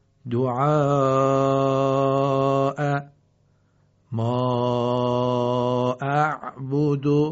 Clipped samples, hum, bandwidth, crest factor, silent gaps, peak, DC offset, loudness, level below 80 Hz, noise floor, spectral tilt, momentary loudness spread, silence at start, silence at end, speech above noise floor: under 0.1%; none; 7.6 kHz; 16 dB; none; -8 dBFS; under 0.1%; -22 LUFS; -60 dBFS; -62 dBFS; -7 dB/octave; 6 LU; 0.25 s; 0 s; 42 dB